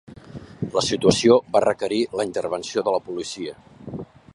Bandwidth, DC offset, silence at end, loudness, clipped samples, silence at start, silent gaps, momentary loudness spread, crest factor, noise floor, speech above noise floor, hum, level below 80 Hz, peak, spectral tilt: 11.5 kHz; under 0.1%; 0.3 s; -21 LUFS; under 0.1%; 0.1 s; none; 20 LU; 22 dB; -40 dBFS; 19 dB; none; -54 dBFS; -2 dBFS; -4.5 dB/octave